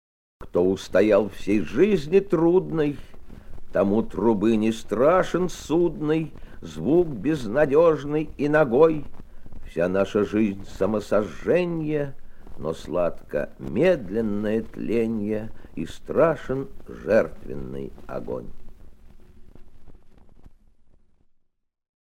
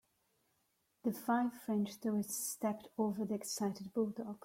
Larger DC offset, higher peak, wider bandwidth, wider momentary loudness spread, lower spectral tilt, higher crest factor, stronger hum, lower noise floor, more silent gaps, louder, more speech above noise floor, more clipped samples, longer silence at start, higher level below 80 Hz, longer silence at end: neither; first, -4 dBFS vs -24 dBFS; about the same, 15 kHz vs 16.5 kHz; first, 15 LU vs 4 LU; first, -7 dB/octave vs -5 dB/octave; about the same, 20 dB vs 16 dB; neither; second, -68 dBFS vs -80 dBFS; neither; first, -23 LUFS vs -38 LUFS; about the same, 45 dB vs 42 dB; neither; second, 0.4 s vs 1.05 s; first, -42 dBFS vs -80 dBFS; first, 1.6 s vs 0.05 s